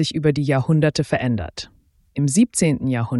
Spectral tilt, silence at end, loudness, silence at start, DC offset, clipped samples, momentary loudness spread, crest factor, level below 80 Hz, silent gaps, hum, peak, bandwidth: -5.5 dB/octave; 0 s; -19 LUFS; 0 s; under 0.1%; under 0.1%; 15 LU; 16 dB; -46 dBFS; none; none; -4 dBFS; 12 kHz